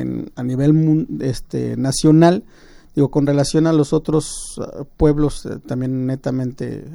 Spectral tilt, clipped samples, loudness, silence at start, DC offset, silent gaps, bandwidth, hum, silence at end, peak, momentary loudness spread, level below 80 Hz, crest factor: -7 dB/octave; under 0.1%; -18 LUFS; 0 s; under 0.1%; none; 12.5 kHz; none; 0 s; 0 dBFS; 13 LU; -36 dBFS; 18 dB